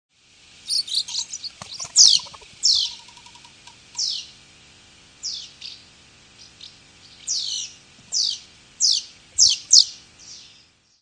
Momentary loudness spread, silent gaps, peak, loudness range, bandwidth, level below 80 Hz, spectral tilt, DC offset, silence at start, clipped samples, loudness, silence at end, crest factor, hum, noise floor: 25 LU; none; 0 dBFS; 13 LU; 10.5 kHz; -64 dBFS; 3 dB/octave; under 0.1%; 0.65 s; under 0.1%; -18 LUFS; 0.6 s; 24 dB; none; -55 dBFS